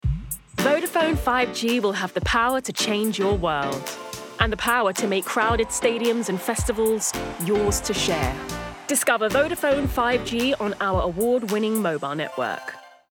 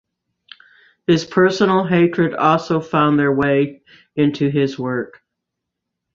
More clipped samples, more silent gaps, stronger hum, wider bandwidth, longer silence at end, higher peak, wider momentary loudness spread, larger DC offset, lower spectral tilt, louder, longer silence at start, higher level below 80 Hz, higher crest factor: neither; neither; neither; first, 19 kHz vs 7.6 kHz; second, 0.2 s vs 1.1 s; about the same, -4 dBFS vs -2 dBFS; about the same, 7 LU vs 9 LU; neither; second, -4 dB/octave vs -7 dB/octave; second, -23 LUFS vs -17 LUFS; second, 0.05 s vs 1.1 s; first, -38 dBFS vs -56 dBFS; about the same, 20 dB vs 16 dB